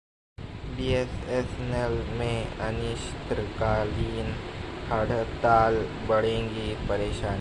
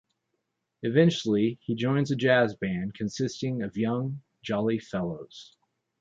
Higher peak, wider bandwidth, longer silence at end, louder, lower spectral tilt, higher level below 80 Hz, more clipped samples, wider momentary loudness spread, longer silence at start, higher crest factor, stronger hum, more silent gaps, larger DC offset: about the same, -8 dBFS vs -8 dBFS; first, 11 kHz vs 7.8 kHz; second, 0 s vs 0.55 s; about the same, -28 LUFS vs -27 LUFS; about the same, -6.5 dB/octave vs -6.5 dB/octave; first, -38 dBFS vs -62 dBFS; neither; about the same, 11 LU vs 12 LU; second, 0.4 s vs 0.85 s; about the same, 18 dB vs 20 dB; neither; neither; neither